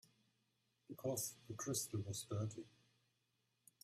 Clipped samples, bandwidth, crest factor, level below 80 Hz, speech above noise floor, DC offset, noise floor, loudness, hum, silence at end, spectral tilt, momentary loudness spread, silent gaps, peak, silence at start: under 0.1%; 15.5 kHz; 18 dB; -80 dBFS; 39 dB; under 0.1%; -85 dBFS; -45 LUFS; none; 1.15 s; -4.5 dB/octave; 14 LU; none; -30 dBFS; 0.9 s